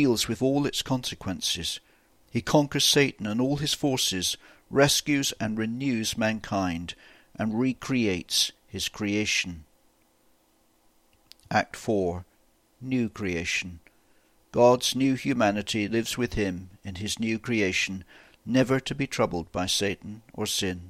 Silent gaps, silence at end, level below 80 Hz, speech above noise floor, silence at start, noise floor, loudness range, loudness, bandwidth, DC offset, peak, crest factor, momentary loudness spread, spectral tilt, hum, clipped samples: none; 0 s; -52 dBFS; 39 dB; 0 s; -65 dBFS; 6 LU; -26 LUFS; 16 kHz; under 0.1%; -6 dBFS; 22 dB; 13 LU; -4 dB/octave; none; under 0.1%